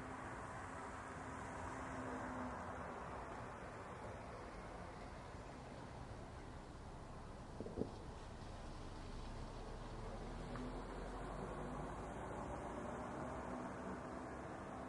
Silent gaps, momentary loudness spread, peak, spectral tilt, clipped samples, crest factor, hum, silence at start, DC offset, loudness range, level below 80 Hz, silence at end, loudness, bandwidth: none; 6 LU; -26 dBFS; -6 dB/octave; under 0.1%; 24 dB; none; 0 s; under 0.1%; 4 LU; -58 dBFS; 0 s; -50 LUFS; 11.5 kHz